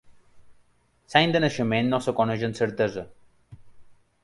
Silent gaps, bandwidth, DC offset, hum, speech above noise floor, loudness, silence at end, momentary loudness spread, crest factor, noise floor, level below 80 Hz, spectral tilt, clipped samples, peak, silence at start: none; 11.5 kHz; under 0.1%; none; 39 dB; -24 LUFS; 0.3 s; 7 LU; 24 dB; -63 dBFS; -58 dBFS; -5.5 dB/octave; under 0.1%; -2 dBFS; 0.1 s